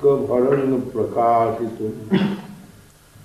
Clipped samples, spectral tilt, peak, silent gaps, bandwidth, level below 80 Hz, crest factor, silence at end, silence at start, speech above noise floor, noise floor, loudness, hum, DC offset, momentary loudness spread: under 0.1%; -8 dB/octave; -6 dBFS; none; 13.5 kHz; -54 dBFS; 14 dB; 0.6 s; 0 s; 28 dB; -47 dBFS; -20 LUFS; none; under 0.1%; 10 LU